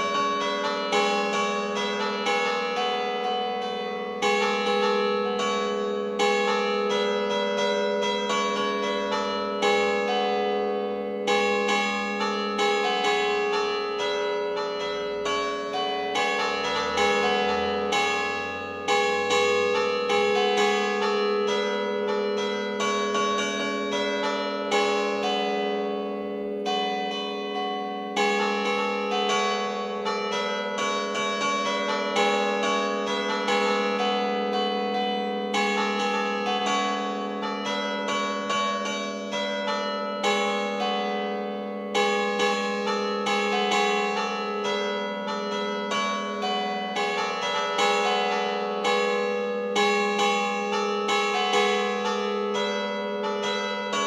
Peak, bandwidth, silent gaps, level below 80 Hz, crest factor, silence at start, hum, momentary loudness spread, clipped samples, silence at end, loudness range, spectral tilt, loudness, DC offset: -10 dBFS; 13 kHz; none; -66 dBFS; 16 dB; 0 s; none; 6 LU; under 0.1%; 0 s; 3 LU; -3 dB/octave; -25 LUFS; under 0.1%